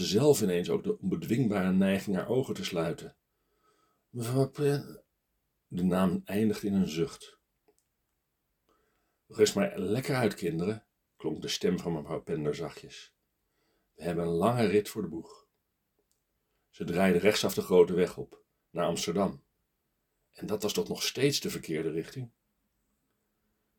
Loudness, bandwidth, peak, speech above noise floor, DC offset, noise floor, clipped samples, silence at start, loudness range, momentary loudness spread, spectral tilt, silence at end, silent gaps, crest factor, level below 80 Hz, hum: -30 LUFS; 19 kHz; -10 dBFS; 51 dB; under 0.1%; -80 dBFS; under 0.1%; 0 s; 6 LU; 16 LU; -5.5 dB/octave; 1.5 s; none; 22 dB; -64 dBFS; none